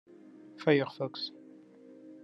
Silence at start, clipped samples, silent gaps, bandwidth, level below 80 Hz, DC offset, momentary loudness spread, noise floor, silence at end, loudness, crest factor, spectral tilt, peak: 0.55 s; under 0.1%; none; 7.2 kHz; -88 dBFS; under 0.1%; 26 LU; -54 dBFS; 0 s; -32 LUFS; 24 dB; -7.5 dB/octave; -10 dBFS